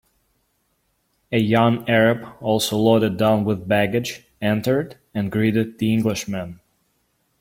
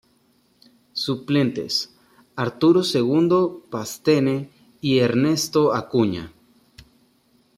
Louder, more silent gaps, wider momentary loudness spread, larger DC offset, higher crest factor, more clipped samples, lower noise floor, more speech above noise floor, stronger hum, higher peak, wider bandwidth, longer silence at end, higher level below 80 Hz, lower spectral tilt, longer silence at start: about the same, -20 LUFS vs -21 LUFS; neither; second, 10 LU vs 14 LU; neither; about the same, 18 dB vs 16 dB; neither; first, -68 dBFS vs -62 dBFS; first, 49 dB vs 42 dB; neither; first, -2 dBFS vs -6 dBFS; about the same, 16.5 kHz vs 16 kHz; second, 0.85 s vs 1.3 s; first, -54 dBFS vs -62 dBFS; about the same, -6 dB/octave vs -5.5 dB/octave; first, 1.3 s vs 0.95 s